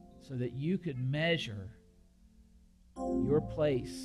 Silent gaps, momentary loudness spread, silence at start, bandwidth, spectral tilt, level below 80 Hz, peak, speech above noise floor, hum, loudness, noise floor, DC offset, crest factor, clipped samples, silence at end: none; 14 LU; 0.05 s; 12.5 kHz; -6.5 dB/octave; -56 dBFS; -18 dBFS; 29 dB; none; -34 LUFS; -62 dBFS; under 0.1%; 18 dB; under 0.1%; 0 s